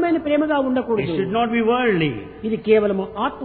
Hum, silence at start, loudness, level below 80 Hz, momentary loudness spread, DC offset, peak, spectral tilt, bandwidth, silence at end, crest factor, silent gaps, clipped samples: none; 0 s; -20 LUFS; -50 dBFS; 7 LU; under 0.1%; -4 dBFS; -10.5 dB/octave; 4.5 kHz; 0 s; 16 dB; none; under 0.1%